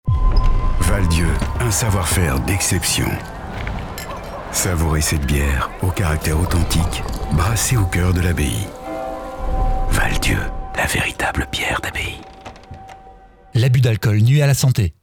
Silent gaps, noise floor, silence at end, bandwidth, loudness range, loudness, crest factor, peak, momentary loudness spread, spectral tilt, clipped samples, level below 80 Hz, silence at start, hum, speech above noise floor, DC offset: none; -43 dBFS; 0.1 s; 19.5 kHz; 3 LU; -19 LUFS; 14 dB; -4 dBFS; 12 LU; -4.5 dB/octave; under 0.1%; -24 dBFS; 0.05 s; none; 26 dB; under 0.1%